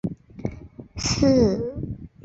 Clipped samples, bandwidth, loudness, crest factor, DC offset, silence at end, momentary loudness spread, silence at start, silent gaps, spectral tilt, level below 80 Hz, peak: under 0.1%; 8 kHz; -22 LUFS; 18 dB; under 0.1%; 0.2 s; 18 LU; 0.05 s; none; -5.5 dB/octave; -40 dBFS; -6 dBFS